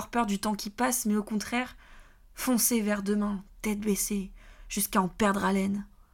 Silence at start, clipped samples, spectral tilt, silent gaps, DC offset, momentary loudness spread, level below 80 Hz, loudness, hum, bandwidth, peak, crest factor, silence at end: 0 s; under 0.1%; -4 dB/octave; none; under 0.1%; 9 LU; -52 dBFS; -29 LUFS; none; 17.5 kHz; -12 dBFS; 18 dB; 0.3 s